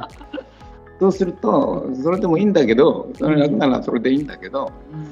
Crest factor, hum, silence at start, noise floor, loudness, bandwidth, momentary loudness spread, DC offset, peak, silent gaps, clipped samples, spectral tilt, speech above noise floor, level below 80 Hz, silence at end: 16 dB; none; 0 s; -41 dBFS; -18 LUFS; 7.6 kHz; 16 LU; under 0.1%; -2 dBFS; none; under 0.1%; -7.5 dB/octave; 24 dB; -46 dBFS; 0 s